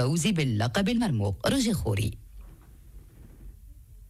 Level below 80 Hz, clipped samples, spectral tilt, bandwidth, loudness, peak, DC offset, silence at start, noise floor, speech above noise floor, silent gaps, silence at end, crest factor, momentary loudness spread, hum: -46 dBFS; under 0.1%; -5.5 dB/octave; 15.5 kHz; -27 LUFS; -16 dBFS; under 0.1%; 0 s; -49 dBFS; 23 dB; none; 0 s; 14 dB; 5 LU; none